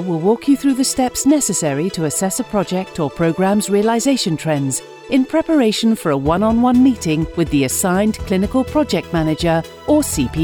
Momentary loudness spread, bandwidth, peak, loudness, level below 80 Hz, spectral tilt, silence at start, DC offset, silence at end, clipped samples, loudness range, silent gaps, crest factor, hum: 5 LU; 20 kHz; -4 dBFS; -17 LUFS; -38 dBFS; -5 dB/octave; 0 s; under 0.1%; 0 s; under 0.1%; 2 LU; none; 12 dB; none